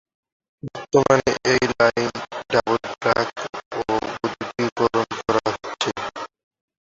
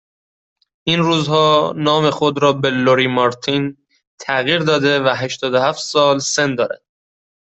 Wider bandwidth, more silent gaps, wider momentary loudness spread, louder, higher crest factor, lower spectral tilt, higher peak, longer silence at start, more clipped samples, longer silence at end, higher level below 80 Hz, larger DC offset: about the same, 7.8 kHz vs 8.4 kHz; about the same, 3.66-3.71 s, 4.72-4.76 s vs 4.07-4.18 s; first, 14 LU vs 7 LU; second, -22 LUFS vs -16 LUFS; first, 20 dB vs 14 dB; about the same, -4.5 dB/octave vs -4.5 dB/octave; about the same, -2 dBFS vs -2 dBFS; second, 0.65 s vs 0.85 s; neither; second, 0.6 s vs 0.75 s; first, -52 dBFS vs -58 dBFS; neither